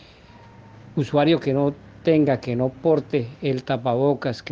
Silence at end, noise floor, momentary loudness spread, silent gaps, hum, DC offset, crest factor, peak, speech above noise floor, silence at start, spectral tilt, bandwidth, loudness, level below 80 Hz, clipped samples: 0 s; -47 dBFS; 8 LU; none; none; under 0.1%; 16 dB; -6 dBFS; 26 dB; 0.85 s; -8 dB/octave; 7.4 kHz; -22 LUFS; -56 dBFS; under 0.1%